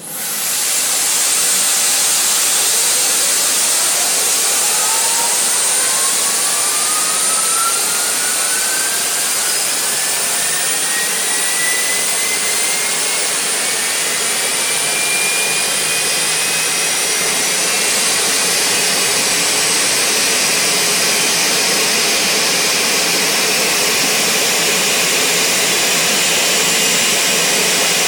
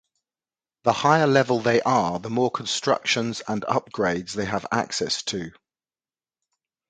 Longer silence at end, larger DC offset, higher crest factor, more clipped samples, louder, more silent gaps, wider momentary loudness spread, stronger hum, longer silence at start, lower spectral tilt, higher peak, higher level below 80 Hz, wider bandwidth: second, 0 s vs 1.4 s; neither; second, 10 dB vs 22 dB; neither; first, -12 LUFS vs -23 LUFS; neither; second, 3 LU vs 9 LU; neither; second, 0 s vs 0.85 s; second, 0.5 dB/octave vs -4 dB/octave; about the same, -6 dBFS vs -4 dBFS; about the same, -58 dBFS vs -60 dBFS; first, over 20 kHz vs 9.4 kHz